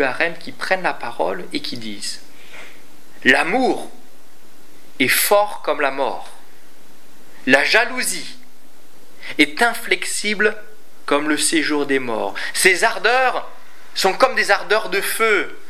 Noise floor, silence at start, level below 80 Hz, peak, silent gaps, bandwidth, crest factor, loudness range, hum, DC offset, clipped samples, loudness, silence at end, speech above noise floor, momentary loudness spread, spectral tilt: -50 dBFS; 0 s; -64 dBFS; 0 dBFS; none; 16 kHz; 20 dB; 4 LU; none; 5%; under 0.1%; -18 LUFS; 0.15 s; 32 dB; 14 LU; -2 dB/octave